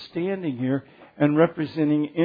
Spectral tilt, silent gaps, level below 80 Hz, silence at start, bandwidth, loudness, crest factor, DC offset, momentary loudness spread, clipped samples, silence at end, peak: -10 dB/octave; none; -68 dBFS; 0 s; 5 kHz; -24 LUFS; 18 dB; under 0.1%; 8 LU; under 0.1%; 0 s; -6 dBFS